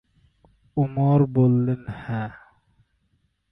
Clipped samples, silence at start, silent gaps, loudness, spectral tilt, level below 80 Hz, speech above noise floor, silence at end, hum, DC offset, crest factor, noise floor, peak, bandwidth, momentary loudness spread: under 0.1%; 0.75 s; none; -22 LUFS; -12 dB/octave; -54 dBFS; 48 dB; 1.2 s; none; under 0.1%; 16 dB; -69 dBFS; -8 dBFS; 3.9 kHz; 12 LU